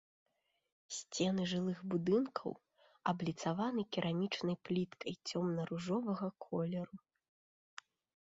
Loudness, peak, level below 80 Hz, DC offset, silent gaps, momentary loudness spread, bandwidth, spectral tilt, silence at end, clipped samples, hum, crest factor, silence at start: -39 LUFS; -22 dBFS; -76 dBFS; under 0.1%; none; 13 LU; 7.6 kHz; -5.5 dB/octave; 1.3 s; under 0.1%; none; 18 dB; 0.9 s